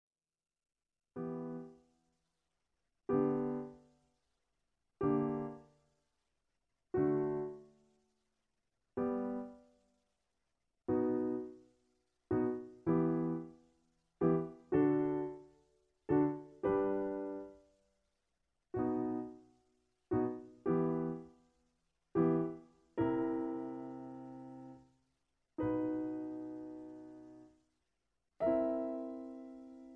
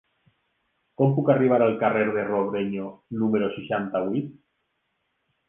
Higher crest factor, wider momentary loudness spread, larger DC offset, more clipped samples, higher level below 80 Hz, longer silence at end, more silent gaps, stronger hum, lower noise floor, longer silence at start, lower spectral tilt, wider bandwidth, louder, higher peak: about the same, 20 dB vs 18 dB; first, 18 LU vs 10 LU; neither; neither; about the same, -70 dBFS vs -66 dBFS; second, 0 s vs 1.15 s; neither; neither; first, -87 dBFS vs -75 dBFS; first, 1.15 s vs 1 s; about the same, -10.5 dB/octave vs -11 dB/octave; about the same, 3.5 kHz vs 3.7 kHz; second, -37 LUFS vs -24 LUFS; second, -20 dBFS vs -6 dBFS